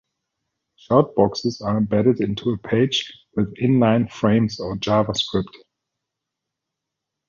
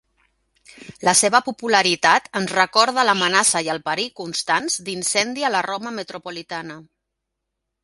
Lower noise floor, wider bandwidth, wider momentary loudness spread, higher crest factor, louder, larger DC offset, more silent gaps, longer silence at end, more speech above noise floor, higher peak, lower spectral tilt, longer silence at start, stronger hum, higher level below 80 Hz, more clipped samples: about the same, -83 dBFS vs -80 dBFS; second, 7.4 kHz vs 12 kHz; second, 8 LU vs 15 LU; about the same, 20 dB vs 22 dB; about the same, -20 LUFS vs -19 LUFS; neither; neither; first, 1.75 s vs 1 s; about the same, 63 dB vs 60 dB; about the same, -2 dBFS vs 0 dBFS; first, -6.5 dB/octave vs -1.5 dB/octave; about the same, 0.9 s vs 0.8 s; neither; first, -50 dBFS vs -64 dBFS; neither